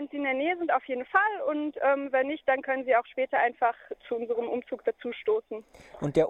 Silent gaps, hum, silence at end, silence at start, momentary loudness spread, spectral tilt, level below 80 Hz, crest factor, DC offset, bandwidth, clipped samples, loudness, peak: none; none; 0 s; 0 s; 8 LU; -6.5 dB/octave; -64 dBFS; 18 dB; under 0.1%; 8.4 kHz; under 0.1%; -28 LUFS; -10 dBFS